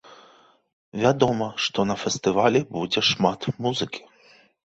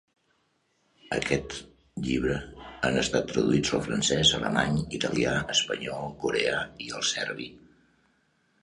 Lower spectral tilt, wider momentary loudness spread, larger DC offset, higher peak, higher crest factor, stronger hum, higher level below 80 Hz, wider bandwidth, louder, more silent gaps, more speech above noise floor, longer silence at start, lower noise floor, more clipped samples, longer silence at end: about the same, -4.5 dB/octave vs -3.5 dB/octave; second, 8 LU vs 13 LU; neither; first, -4 dBFS vs -8 dBFS; about the same, 22 dB vs 22 dB; neither; second, -58 dBFS vs -50 dBFS; second, 8.2 kHz vs 11.5 kHz; first, -23 LUFS vs -27 LUFS; first, 0.73-0.92 s vs none; second, 33 dB vs 44 dB; second, 0.1 s vs 1.05 s; second, -56 dBFS vs -71 dBFS; neither; second, 0.7 s vs 1.05 s